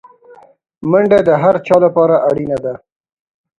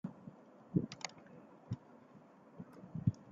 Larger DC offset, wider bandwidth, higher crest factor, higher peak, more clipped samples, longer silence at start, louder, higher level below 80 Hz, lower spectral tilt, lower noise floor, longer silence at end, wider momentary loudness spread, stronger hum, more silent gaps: neither; first, 9.2 kHz vs 7.6 kHz; second, 14 dB vs 26 dB; first, 0 dBFS vs -18 dBFS; neither; first, 0.8 s vs 0.05 s; first, -12 LUFS vs -43 LUFS; first, -52 dBFS vs -70 dBFS; first, -8.5 dB/octave vs -7 dB/octave; second, -43 dBFS vs -61 dBFS; first, 0.8 s vs 0 s; second, 13 LU vs 21 LU; neither; neither